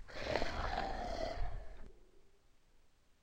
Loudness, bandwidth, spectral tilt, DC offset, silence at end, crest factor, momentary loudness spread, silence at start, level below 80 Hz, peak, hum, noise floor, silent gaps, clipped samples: -41 LUFS; 9.2 kHz; -5 dB/octave; under 0.1%; 0.35 s; 22 dB; 16 LU; 0 s; -48 dBFS; -18 dBFS; none; -66 dBFS; none; under 0.1%